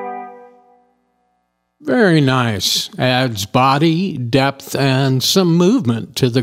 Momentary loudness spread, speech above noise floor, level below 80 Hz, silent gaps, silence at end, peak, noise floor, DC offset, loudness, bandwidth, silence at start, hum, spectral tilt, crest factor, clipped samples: 7 LU; 53 dB; -54 dBFS; none; 0 s; 0 dBFS; -67 dBFS; under 0.1%; -15 LUFS; 16 kHz; 0 s; 60 Hz at -40 dBFS; -5 dB/octave; 16 dB; under 0.1%